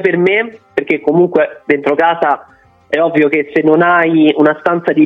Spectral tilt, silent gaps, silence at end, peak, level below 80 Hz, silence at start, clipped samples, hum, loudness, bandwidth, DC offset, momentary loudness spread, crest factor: -8 dB/octave; none; 0 s; 0 dBFS; -58 dBFS; 0 s; under 0.1%; none; -12 LUFS; 5.4 kHz; under 0.1%; 7 LU; 12 dB